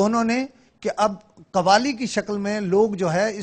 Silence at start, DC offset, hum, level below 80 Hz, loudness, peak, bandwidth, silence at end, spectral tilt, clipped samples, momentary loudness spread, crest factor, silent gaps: 0 s; under 0.1%; none; -58 dBFS; -22 LUFS; -2 dBFS; 9.4 kHz; 0 s; -5 dB/octave; under 0.1%; 11 LU; 20 dB; none